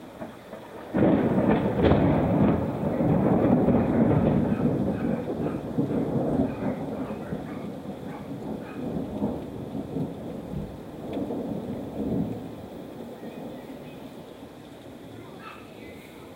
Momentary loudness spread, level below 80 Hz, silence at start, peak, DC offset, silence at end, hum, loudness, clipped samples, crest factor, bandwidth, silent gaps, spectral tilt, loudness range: 21 LU; -46 dBFS; 0 s; -6 dBFS; under 0.1%; 0 s; none; -26 LUFS; under 0.1%; 22 dB; 16 kHz; none; -9 dB/octave; 13 LU